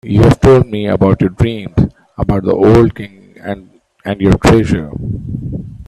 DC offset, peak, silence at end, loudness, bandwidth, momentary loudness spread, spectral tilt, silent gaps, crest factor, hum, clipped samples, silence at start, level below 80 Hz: under 0.1%; 0 dBFS; 0.05 s; -12 LUFS; 13 kHz; 17 LU; -8 dB/octave; none; 12 dB; none; under 0.1%; 0.05 s; -28 dBFS